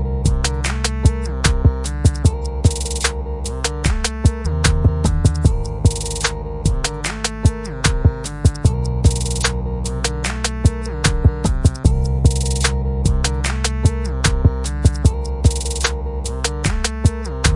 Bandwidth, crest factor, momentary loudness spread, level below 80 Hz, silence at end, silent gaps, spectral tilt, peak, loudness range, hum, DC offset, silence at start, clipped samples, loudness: 11.5 kHz; 16 dB; 5 LU; -22 dBFS; 0 s; none; -4.5 dB/octave; 0 dBFS; 1 LU; none; under 0.1%; 0 s; under 0.1%; -19 LUFS